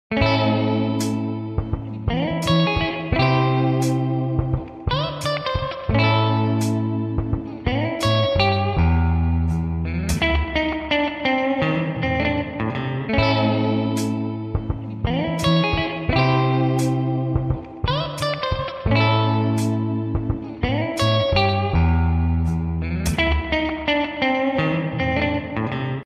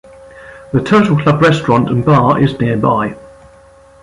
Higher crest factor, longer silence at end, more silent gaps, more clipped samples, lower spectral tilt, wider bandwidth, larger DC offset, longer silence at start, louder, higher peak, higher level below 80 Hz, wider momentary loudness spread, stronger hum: about the same, 14 dB vs 12 dB; second, 0 s vs 0.75 s; neither; neither; about the same, -6.5 dB/octave vs -7.5 dB/octave; first, 14 kHz vs 11 kHz; neither; second, 0.1 s vs 0.35 s; second, -21 LUFS vs -12 LUFS; second, -6 dBFS vs 0 dBFS; first, -32 dBFS vs -42 dBFS; about the same, 7 LU vs 7 LU; neither